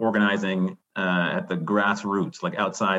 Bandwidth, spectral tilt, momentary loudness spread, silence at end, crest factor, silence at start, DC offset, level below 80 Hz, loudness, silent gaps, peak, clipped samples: 8 kHz; -5.5 dB/octave; 6 LU; 0 s; 16 dB; 0 s; under 0.1%; -72 dBFS; -25 LUFS; none; -8 dBFS; under 0.1%